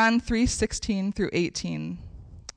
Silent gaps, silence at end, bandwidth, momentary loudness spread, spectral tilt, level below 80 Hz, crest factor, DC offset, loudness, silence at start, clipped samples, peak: none; 0.15 s; 10.5 kHz; 16 LU; -4.5 dB/octave; -40 dBFS; 12 dB; under 0.1%; -27 LUFS; 0 s; under 0.1%; -14 dBFS